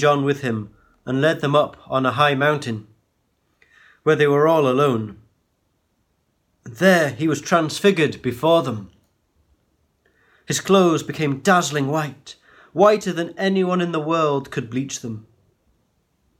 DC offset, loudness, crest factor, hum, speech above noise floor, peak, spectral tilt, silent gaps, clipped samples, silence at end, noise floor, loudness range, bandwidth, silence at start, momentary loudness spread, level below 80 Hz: under 0.1%; -19 LUFS; 18 dB; none; 49 dB; -4 dBFS; -5 dB/octave; none; under 0.1%; 1.2 s; -68 dBFS; 2 LU; 17 kHz; 0 s; 14 LU; -60 dBFS